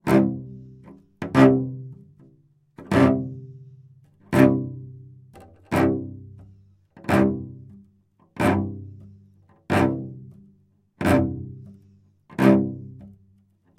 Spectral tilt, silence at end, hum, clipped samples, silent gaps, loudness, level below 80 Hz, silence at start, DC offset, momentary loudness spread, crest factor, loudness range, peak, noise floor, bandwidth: -7.5 dB/octave; 0.7 s; none; under 0.1%; none; -21 LUFS; -52 dBFS; 0.05 s; under 0.1%; 25 LU; 22 dB; 4 LU; -2 dBFS; -61 dBFS; 15 kHz